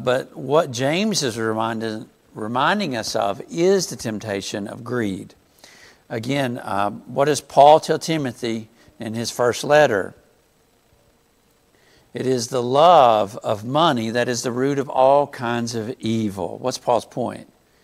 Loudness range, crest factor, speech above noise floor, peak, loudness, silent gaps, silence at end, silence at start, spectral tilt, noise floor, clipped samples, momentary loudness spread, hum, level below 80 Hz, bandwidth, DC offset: 6 LU; 20 dB; 40 dB; 0 dBFS; -20 LUFS; none; 0.4 s; 0 s; -4.5 dB/octave; -60 dBFS; under 0.1%; 14 LU; none; -62 dBFS; 15.5 kHz; under 0.1%